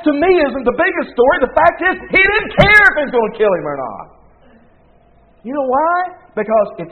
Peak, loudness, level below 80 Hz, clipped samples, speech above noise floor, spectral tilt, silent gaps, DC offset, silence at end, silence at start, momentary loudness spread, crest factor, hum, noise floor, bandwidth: 0 dBFS; -13 LUFS; -38 dBFS; 0.1%; 36 dB; -6.5 dB/octave; none; 0.1%; 0 s; 0 s; 15 LU; 14 dB; none; -49 dBFS; 12 kHz